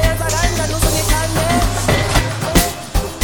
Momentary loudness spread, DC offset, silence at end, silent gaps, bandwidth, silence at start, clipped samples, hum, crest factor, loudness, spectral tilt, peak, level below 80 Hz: 3 LU; 0.7%; 0 s; none; 19 kHz; 0 s; under 0.1%; none; 16 dB; -16 LUFS; -4 dB/octave; 0 dBFS; -22 dBFS